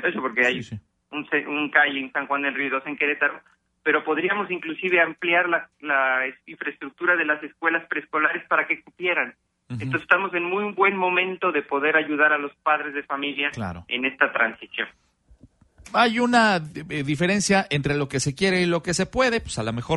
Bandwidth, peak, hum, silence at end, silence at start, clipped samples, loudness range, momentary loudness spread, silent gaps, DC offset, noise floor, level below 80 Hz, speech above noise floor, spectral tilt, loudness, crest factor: 11.5 kHz; -2 dBFS; none; 0 s; 0 s; under 0.1%; 2 LU; 10 LU; none; under 0.1%; -55 dBFS; -54 dBFS; 31 dB; -4 dB/octave; -23 LUFS; 22 dB